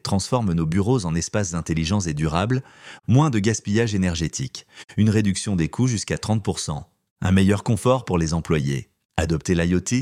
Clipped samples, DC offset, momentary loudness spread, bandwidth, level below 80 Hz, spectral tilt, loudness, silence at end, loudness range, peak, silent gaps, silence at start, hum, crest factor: under 0.1%; under 0.1%; 10 LU; 14 kHz; -42 dBFS; -5.5 dB/octave; -22 LUFS; 0 s; 1 LU; -4 dBFS; 7.11-7.16 s, 9.05-9.09 s; 0.05 s; none; 18 dB